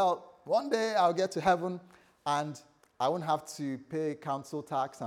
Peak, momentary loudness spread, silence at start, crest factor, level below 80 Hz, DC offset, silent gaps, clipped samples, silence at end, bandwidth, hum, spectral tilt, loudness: -14 dBFS; 11 LU; 0 s; 18 dB; -72 dBFS; under 0.1%; none; under 0.1%; 0 s; 15 kHz; none; -5 dB/octave; -32 LUFS